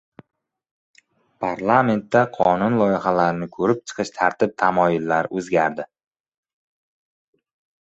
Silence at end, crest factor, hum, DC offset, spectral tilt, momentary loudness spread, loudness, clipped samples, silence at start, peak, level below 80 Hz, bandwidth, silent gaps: 1.95 s; 20 dB; none; under 0.1%; -6.5 dB/octave; 7 LU; -20 LUFS; under 0.1%; 1.4 s; -2 dBFS; -58 dBFS; 8.2 kHz; none